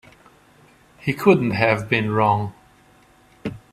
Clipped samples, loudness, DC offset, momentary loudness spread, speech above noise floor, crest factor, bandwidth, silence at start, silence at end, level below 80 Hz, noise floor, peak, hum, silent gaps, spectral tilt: under 0.1%; -19 LUFS; under 0.1%; 17 LU; 35 dB; 20 dB; 15 kHz; 1.05 s; 0.15 s; -54 dBFS; -53 dBFS; -2 dBFS; none; none; -7 dB/octave